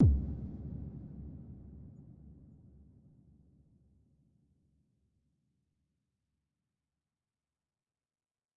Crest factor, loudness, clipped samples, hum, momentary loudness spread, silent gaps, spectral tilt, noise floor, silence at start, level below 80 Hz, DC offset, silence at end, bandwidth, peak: 24 dB; -39 LUFS; under 0.1%; none; 22 LU; none; -14.5 dB/octave; under -90 dBFS; 0 s; -46 dBFS; under 0.1%; 6.1 s; 1.6 kHz; -16 dBFS